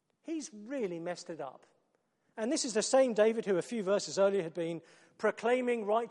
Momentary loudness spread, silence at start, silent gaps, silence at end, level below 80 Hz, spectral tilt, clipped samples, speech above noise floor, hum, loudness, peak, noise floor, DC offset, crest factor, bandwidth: 14 LU; 0.25 s; none; 0 s; -86 dBFS; -4 dB/octave; under 0.1%; 45 dB; none; -32 LUFS; -14 dBFS; -77 dBFS; under 0.1%; 18 dB; 11.5 kHz